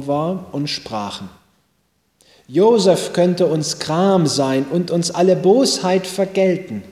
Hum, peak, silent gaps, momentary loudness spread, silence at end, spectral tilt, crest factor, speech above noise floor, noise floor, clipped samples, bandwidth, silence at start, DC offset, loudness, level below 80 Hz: none; -2 dBFS; none; 11 LU; 0 s; -5 dB/octave; 16 dB; 48 dB; -65 dBFS; under 0.1%; 15.5 kHz; 0 s; under 0.1%; -17 LUFS; -58 dBFS